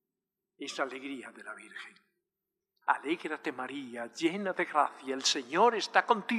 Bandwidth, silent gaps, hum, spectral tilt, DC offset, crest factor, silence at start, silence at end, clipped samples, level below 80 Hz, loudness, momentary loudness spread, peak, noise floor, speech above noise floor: 13 kHz; none; none; -2.5 dB/octave; under 0.1%; 24 dB; 0.6 s; 0 s; under 0.1%; under -90 dBFS; -31 LUFS; 18 LU; -8 dBFS; -89 dBFS; 57 dB